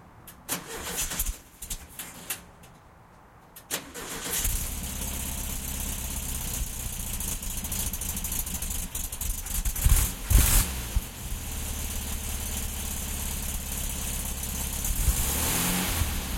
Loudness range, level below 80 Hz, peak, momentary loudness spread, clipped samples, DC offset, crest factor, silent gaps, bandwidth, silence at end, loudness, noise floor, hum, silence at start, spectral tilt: 8 LU; -32 dBFS; -6 dBFS; 11 LU; under 0.1%; under 0.1%; 24 dB; none; 17 kHz; 0 s; -29 LUFS; -53 dBFS; none; 0 s; -2.5 dB/octave